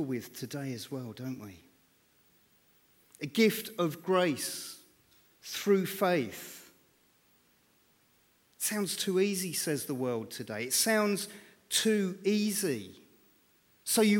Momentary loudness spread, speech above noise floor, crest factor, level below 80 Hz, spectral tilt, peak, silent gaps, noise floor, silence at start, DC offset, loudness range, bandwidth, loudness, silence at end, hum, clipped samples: 16 LU; 37 dB; 20 dB; -80 dBFS; -3.5 dB/octave; -14 dBFS; none; -68 dBFS; 0 s; under 0.1%; 5 LU; 18.5 kHz; -31 LUFS; 0 s; none; under 0.1%